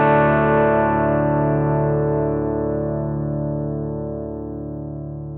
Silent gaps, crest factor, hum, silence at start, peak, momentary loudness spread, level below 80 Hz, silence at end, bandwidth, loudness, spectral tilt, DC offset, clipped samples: none; 14 dB; none; 0 s; -6 dBFS; 14 LU; -38 dBFS; 0 s; 3.9 kHz; -20 LUFS; -13 dB/octave; under 0.1%; under 0.1%